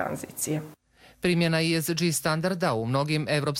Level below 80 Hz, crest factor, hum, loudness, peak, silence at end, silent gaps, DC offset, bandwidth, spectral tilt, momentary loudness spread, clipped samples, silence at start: -58 dBFS; 16 dB; none; -26 LUFS; -12 dBFS; 0 s; none; under 0.1%; 16.5 kHz; -4.5 dB/octave; 8 LU; under 0.1%; 0 s